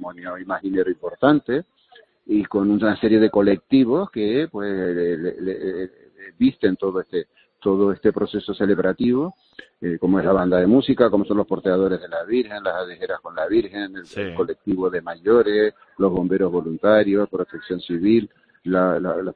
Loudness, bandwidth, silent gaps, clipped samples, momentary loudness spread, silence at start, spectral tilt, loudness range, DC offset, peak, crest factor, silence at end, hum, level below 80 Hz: -21 LUFS; 4.8 kHz; none; under 0.1%; 12 LU; 0 s; -9 dB/octave; 4 LU; under 0.1%; 0 dBFS; 20 dB; 0.05 s; none; -54 dBFS